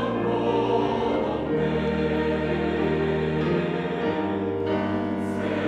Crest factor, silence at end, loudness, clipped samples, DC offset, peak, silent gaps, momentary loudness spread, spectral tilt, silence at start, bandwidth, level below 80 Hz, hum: 14 dB; 0 s; -25 LUFS; under 0.1%; under 0.1%; -10 dBFS; none; 3 LU; -8 dB/octave; 0 s; 10 kHz; -46 dBFS; none